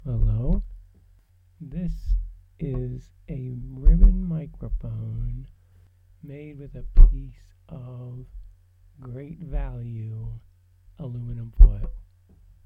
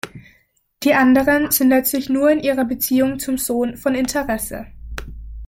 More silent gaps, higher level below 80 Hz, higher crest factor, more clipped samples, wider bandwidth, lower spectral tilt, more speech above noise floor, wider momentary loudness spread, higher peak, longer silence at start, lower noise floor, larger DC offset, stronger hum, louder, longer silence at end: neither; first, -24 dBFS vs -40 dBFS; first, 22 dB vs 16 dB; neither; second, 2.3 kHz vs 17 kHz; first, -11 dB/octave vs -4 dB/octave; second, 26 dB vs 42 dB; first, 23 LU vs 20 LU; about the same, 0 dBFS vs -2 dBFS; about the same, 0.05 s vs 0.05 s; about the same, -57 dBFS vs -60 dBFS; neither; neither; second, -27 LUFS vs -17 LUFS; first, 0.65 s vs 0 s